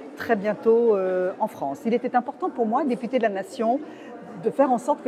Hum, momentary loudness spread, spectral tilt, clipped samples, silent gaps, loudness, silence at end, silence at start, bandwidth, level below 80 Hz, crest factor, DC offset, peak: none; 9 LU; -6.5 dB/octave; under 0.1%; none; -24 LUFS; 0 s; 0 s; 14 kHz; -76 dBFS; 16 dB; under 0.1%; -6 dBFS